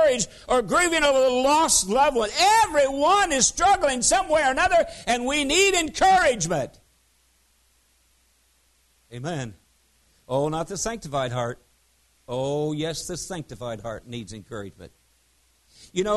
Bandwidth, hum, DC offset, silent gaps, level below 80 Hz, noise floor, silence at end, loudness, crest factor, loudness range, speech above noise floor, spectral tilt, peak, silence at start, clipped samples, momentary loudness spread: 12.5 kHz; none; under 0.1%; none; -48 dBFS; -64 dBFS; 0 s; -21 LUFS; 18 dB; 15 LU; 41 dB; -2.5 dB/octave; -6 dBFS; 0 s; under 0.1%; 17 LU